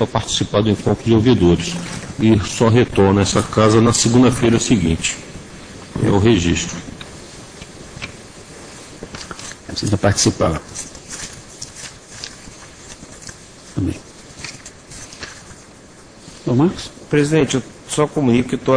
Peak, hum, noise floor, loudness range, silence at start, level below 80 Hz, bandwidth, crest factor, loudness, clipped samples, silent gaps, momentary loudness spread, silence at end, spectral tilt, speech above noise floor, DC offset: 0 dBFS; none; -42 dBFS; 16 LU; 0 s; -38 dBFS; 10.5 kHz; 18 dB; -16 LUFS; under 0.1%; none; 22 LU; 0 s; -5 dB/octave; 27 dB; under 0.1%